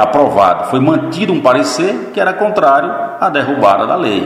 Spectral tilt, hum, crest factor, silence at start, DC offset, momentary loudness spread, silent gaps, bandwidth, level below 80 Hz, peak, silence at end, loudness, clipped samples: -5.5 dB/octave; none; 12 dB; 0 s; under 0.1%; 5 LU; none; 14 kHz; -54 dBFS; 0 dBFS; 0 s; -12 LUFS; 0.2%